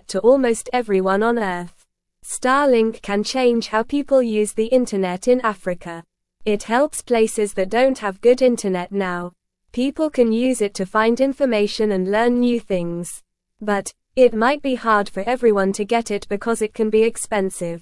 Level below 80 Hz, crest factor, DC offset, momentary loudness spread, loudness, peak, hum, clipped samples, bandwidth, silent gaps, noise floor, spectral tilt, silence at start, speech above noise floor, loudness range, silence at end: -50 dBFS; 16 dB; 0.1%; 11 LU; -19 LUFS; -2 dBFS; none; under 0.1%; 12 kHz; none; -51 dBFS; -4.5 dB/octave; 0.1 s; 32 dB; 2 LU; 0 s